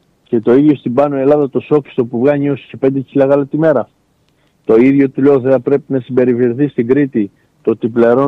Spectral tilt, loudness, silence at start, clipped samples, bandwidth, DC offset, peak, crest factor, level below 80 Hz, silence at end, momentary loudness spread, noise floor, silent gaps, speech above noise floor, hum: -10 dB/octave; -13 LUFS; 0.3 s; under 0.1%; 4.5 kHz; under 0.1%; -2 dBFS; 12 dB; -56 dBFS; 0 s; 8 LU; -56 dBFS; none; 44 dB; none